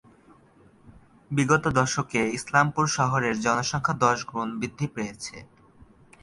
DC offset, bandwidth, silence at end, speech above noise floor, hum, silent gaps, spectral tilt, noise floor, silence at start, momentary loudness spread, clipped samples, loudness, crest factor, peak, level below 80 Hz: under 0.1%; 11.5 kHz; 0.4 s; 31 dB; none; none; -4.5 dB/octave; -56 dBFS; 0.85 s; 11 LU; under 0.1%; -25 LUFS; 22 dB; -6 dBFS; -56 dBFS